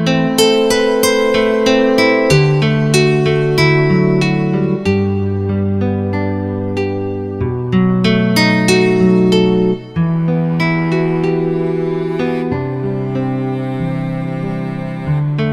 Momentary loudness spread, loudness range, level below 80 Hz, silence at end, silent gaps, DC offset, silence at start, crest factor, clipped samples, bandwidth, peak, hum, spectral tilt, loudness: 8 LU; 6 LU; -42 dBFS; 0 s; none; under 0.1%; 0 s; 14 dB; under 0.1%; 18.5 kHz; 0 dBFS; none; -6 dB/octave; -14 LUFS